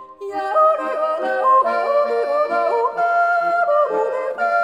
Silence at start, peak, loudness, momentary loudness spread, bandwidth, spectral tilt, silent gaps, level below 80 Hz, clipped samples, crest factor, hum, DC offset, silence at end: 0 s; -6 dBFS; -18 LUFS; 6 LU; 10.5 kHz; -4 dB/octave; none; -70 dBFS; under 0.1%; 12 dB; none; under 0.1%; 0 s